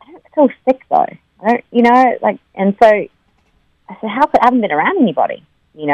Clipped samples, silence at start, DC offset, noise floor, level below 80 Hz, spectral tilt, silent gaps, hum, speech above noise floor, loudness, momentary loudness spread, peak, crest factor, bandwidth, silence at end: 0.1%; 0.15 s; under 0.1%; -57 dBFS; -54 dBFS; -7 dB/octave; none; none; 44 dB; -14 LUFS; 12 LU; 0 dBFS; 14 dB; 8.6 kHz; 0 s